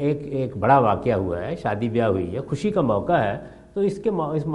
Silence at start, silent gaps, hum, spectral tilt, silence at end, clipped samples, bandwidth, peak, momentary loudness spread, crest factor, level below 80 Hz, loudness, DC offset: 0 s; none; none; -8 dB/octave; 0 s; under 0.1%; 11.5 kHz; -2 dBFS; 9 LU; 20 dB; -50 dBFS; -23 LUFS; under 0.1%